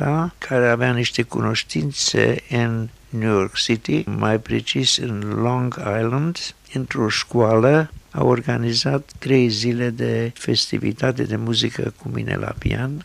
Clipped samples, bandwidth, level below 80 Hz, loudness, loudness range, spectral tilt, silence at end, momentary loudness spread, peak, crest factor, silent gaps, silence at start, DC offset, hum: under 0.1%; 12.5 kHz; -46 dBFS; -20 LUFS; 2 LU; -5 dB/octave; 0 s; 8 LU; -4 dBFS; 18 dB; none; 0 s; under 0.1%; none